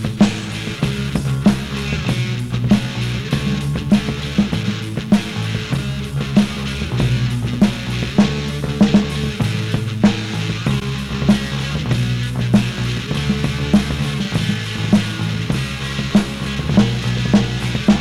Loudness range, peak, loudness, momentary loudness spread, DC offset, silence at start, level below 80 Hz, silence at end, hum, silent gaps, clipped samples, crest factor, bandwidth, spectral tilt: 2 LU; -2 dBFS; -19 LUFS; 6 LU; under 0.1%; 0 s; -32 dBFS; 0 s; none; none; under 0.1%; 16 dB; 13 kHz; -6 dB/octave